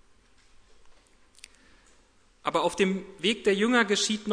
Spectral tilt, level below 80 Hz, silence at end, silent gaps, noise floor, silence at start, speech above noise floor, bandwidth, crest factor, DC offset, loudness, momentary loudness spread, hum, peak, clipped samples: -3.5 dB/octave; -62 dBFS; 0 s; none; -61 dBFS; 0.85 s; 35 dB; 11 kHz; 22 dB; under 0.1%; -26 LUFS; 6 LU; none; -8 dBFS; under 0.1%